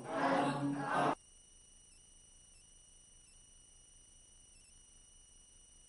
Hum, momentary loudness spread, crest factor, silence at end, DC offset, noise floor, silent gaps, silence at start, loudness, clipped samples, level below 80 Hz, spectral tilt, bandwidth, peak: 60 Hz at -75 dBFS; 25 LU; 22 dB; 4.75 s; under 0.1%; -62 dBFS; none; 0 s; -36 LUFS; under 0.1%; -68 dBFS; -5 dB/octave; 11.5 kHz; -22 dBFS